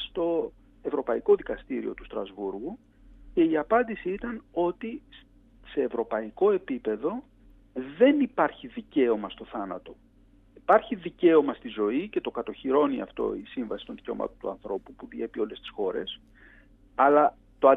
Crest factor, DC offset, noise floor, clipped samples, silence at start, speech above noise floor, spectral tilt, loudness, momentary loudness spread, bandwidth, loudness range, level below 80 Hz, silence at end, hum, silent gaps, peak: 22 dB; under 0.1%; -58 dBFS; under 0.1%; 0 s; 31 dB; -8 dB/octave; -28 LUFS; 16 LU; 4 kHz; 5 LU; -56 dBFS; 0 s; none; none; -6 dBFS